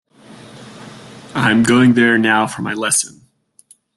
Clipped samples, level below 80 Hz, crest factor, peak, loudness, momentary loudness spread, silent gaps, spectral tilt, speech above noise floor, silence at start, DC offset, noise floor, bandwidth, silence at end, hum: under 0.1%; -54 dBFS; 16 dB; 0 dBFS; -14 LUFS; 25 LU; none; -4 dB/octave; 37 dB; 0.55 s; under 0.1%; -51 dBFS; 12.5 kHz; 0.9 s; none